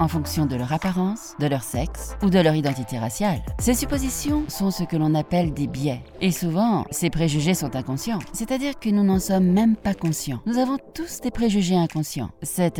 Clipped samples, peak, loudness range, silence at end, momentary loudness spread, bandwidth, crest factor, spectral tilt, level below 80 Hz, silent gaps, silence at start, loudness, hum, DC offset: under 0.1%; -4 dBFS; 2 LU; 0 s; 8 LU; 18 kHz; 18 dB; -5.5 dB/octave; -38 dBFS; none; 0 s; -23 LUFS; none; under 0.1%